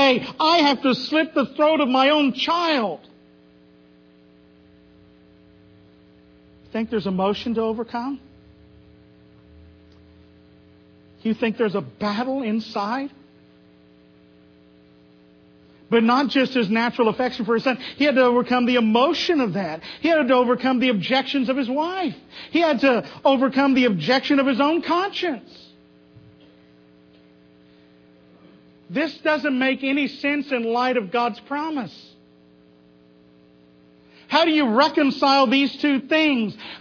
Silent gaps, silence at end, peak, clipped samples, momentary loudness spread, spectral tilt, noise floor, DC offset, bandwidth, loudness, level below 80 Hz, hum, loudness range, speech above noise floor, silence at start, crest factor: none; 0 s; -4 dBFS; under 0.1%; 10 LU; -5.5 dB/octave; -53 dBFS; under 0.1%; 5.4 kHz; -20 LUFS; -62 dBFS; none; 12 LU; 32 dB; 0 s; 18 dB